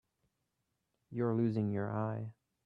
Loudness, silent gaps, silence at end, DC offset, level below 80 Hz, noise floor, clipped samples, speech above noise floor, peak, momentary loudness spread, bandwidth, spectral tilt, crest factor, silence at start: -36 LUFS; none; 0.35 s; under 0.1%; -76 dBFS; -84 dBFS; under 0.1%; 50 dB; -20 dBFS; 12 LU; 5.2 kHz; -11 dB/octave; 16 dB; 1.1 s